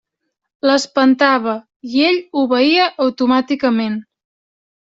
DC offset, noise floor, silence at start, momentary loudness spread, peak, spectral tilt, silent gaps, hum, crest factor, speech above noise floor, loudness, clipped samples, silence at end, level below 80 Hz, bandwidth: under 0.1%; -75 dBFS; 0.65 s; 9 LU; -2 dBFS; -4 dB/octave; 1.76-1.80 s; none; 14 dB; 61 dB; -15 LUFS; under 0.1%; 0.8 s; -62 dBFS; 7.8 kHz